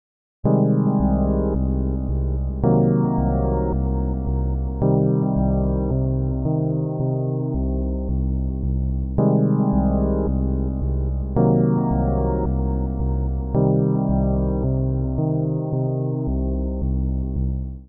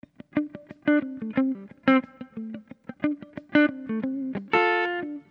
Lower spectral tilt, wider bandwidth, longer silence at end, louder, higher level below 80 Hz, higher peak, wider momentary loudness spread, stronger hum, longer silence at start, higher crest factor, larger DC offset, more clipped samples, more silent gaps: first, -11.5 dB/octave vs -7.5 dB/octave; second, 2 kHz vs 5.6 kHz; about the same, 0 s vs 0.1 s; first, -22 LUFS vs -26 LUFS; first, -26 dBFS vs -68 dBFS; about the same, -6 dBFS vs -6 dBFS; second, 6 LU vs 15 LU; neither; about the same, 0.45 s vs 0.35 s; second, 14 dB vs 20 dB; neither; neither; neither